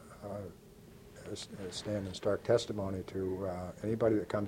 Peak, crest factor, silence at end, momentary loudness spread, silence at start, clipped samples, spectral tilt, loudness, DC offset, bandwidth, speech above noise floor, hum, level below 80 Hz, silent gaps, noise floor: -16 dBFS; 20 dB; 0 s; 20 LU; 0 s; under 0.1%; -6 dB/octave; -36 LUFS; under 0.1%; 16.5 kHz; 20 dB; none; -62 dBFS; none; -55 dBFS